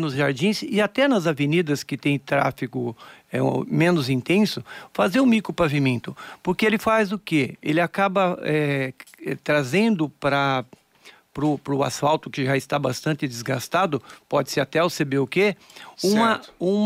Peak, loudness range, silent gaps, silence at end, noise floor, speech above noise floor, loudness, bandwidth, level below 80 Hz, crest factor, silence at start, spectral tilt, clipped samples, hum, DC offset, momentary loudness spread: -10 dBFS; 2 LU; none; 0 s; -52 dBFS; 30 dB; -22 LUFS; 16 kHz; -58 dBFS; 14 dB; 0 s; -5.5 dB/octave; under 0.1%; none; under 0.1%; 9 LU